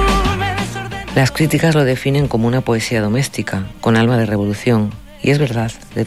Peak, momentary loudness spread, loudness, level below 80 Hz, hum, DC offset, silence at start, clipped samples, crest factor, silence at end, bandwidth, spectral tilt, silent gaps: -4 dBFS; 8 LU; -16 LUFS; -30 dBFS; none; 0.5%; 0 s; under 0.1%; 12 dB; 0 s; 15 kHz; -6 dB/octave; none